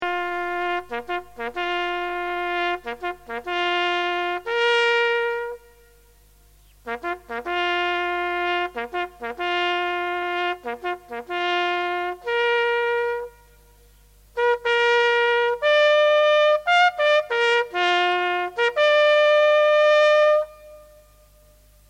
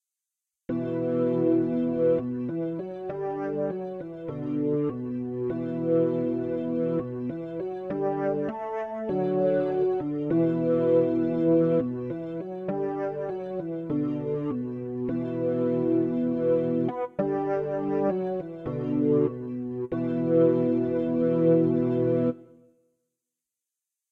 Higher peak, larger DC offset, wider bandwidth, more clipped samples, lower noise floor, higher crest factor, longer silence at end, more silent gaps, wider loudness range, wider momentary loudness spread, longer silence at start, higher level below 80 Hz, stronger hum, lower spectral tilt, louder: first, -6 dBFS vs -10 dBFS; neither; first, 12.5 kHz vs 4.4 kHz; neither; second, -54 dBFS vs -88 dBFS; about the same, 16 dB vs 16 dB; second, 1.05 s vs 1.65 s; neither; first, 8 LU vs 5 LU; first, 14 LU vs 11 LU; second, 0 s vs 0.7 s; first, -56 dBFS vs -62 dBFS; first, 50 Hz at -55 dBFS vs none; second, -2.5 dB/octave vs -11 dB/octave; first, -21 LUFS vs -27 LUFS